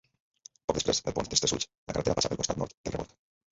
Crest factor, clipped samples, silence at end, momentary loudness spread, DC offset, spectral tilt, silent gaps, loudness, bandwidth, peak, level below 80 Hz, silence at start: 22 dB; under 0.1%; 0.45 s; 10 LU; under 0.1%; -3 dB/octave; 1.77-1.86 s, 2.74-2.84 s; -30 LUFS; 8 kHz; -10 dBFS; -52 dBFS; 0.7 s